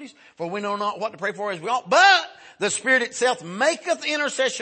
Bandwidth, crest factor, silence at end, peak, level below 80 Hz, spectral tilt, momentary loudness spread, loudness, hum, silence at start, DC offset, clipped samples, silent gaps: 8.8 kHz; 18 dB; 0 s; -4 dBFS; -78 dBFS; -1.5 dB/octave; 13 LU; -21 LUFS; none; 0 s; under 0.1%; under 0.1%; none